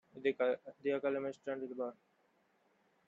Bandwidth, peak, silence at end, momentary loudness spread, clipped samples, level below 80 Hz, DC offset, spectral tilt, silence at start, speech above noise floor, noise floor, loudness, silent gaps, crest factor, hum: 7.6 kHz; -20 dBFS; 1.15 s; 8 LU; under 0.1%; -86 dBFS; under 0.1%; -6.5 dB/octave; 0.15 s; 37 dB; -75 dBFS; -38 LUFS; none; 20 dB; none